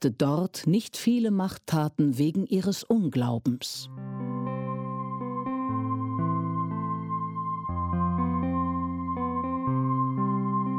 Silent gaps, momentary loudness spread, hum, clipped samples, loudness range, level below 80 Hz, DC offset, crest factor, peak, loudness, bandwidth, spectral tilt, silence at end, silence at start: none; 7 LU; none; under 0.1%; 5 LU; -52 dBFS; under 0.1%; 16 dB; -12 dBFS; -28 LUFS; 17 kHz; -7 dB/octave; 0 s; 0 s